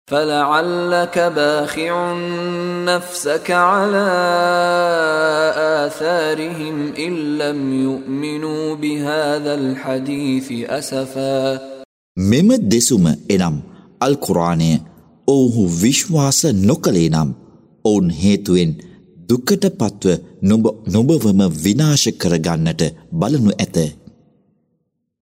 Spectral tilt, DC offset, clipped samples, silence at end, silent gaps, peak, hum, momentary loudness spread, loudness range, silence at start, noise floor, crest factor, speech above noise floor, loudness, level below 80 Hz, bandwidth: -5 dB/octave; under 0.1%; under 0.1%; 1.3 s; 11.85-12.15 s; 0 dBFS; none; 8 LU; 5 LU; 0.1 s; -69 dBFS; 16 dB; 53 dB; -17 LUFS; -48 dBFS; 16 kHz